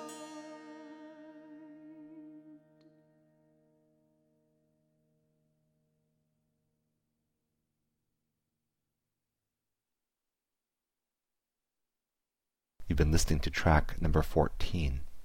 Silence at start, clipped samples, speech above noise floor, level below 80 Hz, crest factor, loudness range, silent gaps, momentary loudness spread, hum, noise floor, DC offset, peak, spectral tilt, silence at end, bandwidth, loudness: 0 s; under 0.1%; over 62 dB; -42 dBFS; 24 dB; 24 LU; none; 24 LU; none; under -90 dBFS; under 0.1%; -12 dBFS; -5.5 dB/octave; 0 s; 16.5 kHz; -31 LUFS